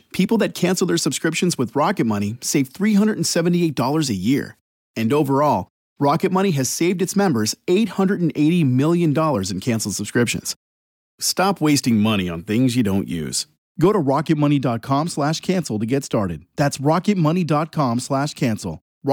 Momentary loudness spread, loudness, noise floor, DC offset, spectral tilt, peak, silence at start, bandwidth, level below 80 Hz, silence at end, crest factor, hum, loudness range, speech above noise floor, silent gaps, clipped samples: 6 LU; -20 LUFS; under -90 dBFS; under 0.1%; -5.5 dB/octave; -6 dBFS; 0.15 s; 17.5 kHz; -56 dBFS; 0 s; 12 dB; none; 2 LU; over 71 dB; 4.61-4.94 s, 5.70-5.96 s, 10.56-11.18 s, 13.58-13.75 s, 18.81-19.01 s; under 0.1%